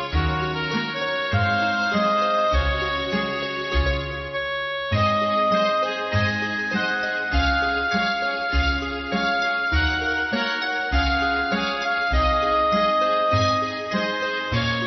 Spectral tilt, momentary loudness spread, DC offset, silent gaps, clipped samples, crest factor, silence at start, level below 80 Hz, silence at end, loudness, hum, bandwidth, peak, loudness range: -5.5 dB/octave; 5 LU; under 0.1%; none; under 0.1%; 14 dB; 0 s; -32 dBFS; 0 s; -22 LUFS; none; 6.2 kHz; -8 dBFS; 2 LU